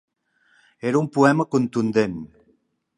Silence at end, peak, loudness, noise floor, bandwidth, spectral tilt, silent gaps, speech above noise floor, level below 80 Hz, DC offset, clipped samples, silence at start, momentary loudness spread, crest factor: 0.7 s; -2 dBFS; -21 LUFS; -65 dBFS; 11.5 kHz; -7 dB/octave; none; 44 dB; -60 dBFS; under 0.1%; under 0.1%; 0.85 s; 14 LU; 20 dB